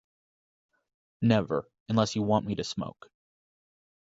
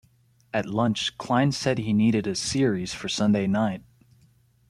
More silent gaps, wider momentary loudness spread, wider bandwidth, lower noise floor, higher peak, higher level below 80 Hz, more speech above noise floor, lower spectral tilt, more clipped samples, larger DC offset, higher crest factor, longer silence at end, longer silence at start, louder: first, 1.80-1.86 s vs none; about the same, 9 LU vs 7 LU; second, 8 kHz vs 12 kHz; first, under -90 dBFS vs -61 dBFS; about the same, -8 dBFS vs -8 dBFS; about the same, -60 dBFS vs -56 dBFS; first, over 62 dB vs 37 dB; about the same, -6 dB/octave vs -5 dB/octave; neither; neither; about the same, 22 dB vs 18 dB; first, 1.15 s vs 0.9 s; first, 1.2 s vs 0.55 s; second, -29 LUFS vs -25 LUFS